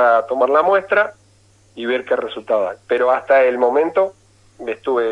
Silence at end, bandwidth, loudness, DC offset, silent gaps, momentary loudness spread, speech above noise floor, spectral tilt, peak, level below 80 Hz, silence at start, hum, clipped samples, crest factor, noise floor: 0 s; 10.5 kHz; -17 LUFS; under 0.1%; none; 9 LU; 36 dB; -5 dB/octave; -2 dBFS; -62 dBFS; 0 s; none; under 0.1%; 14 dB; -53 dBFS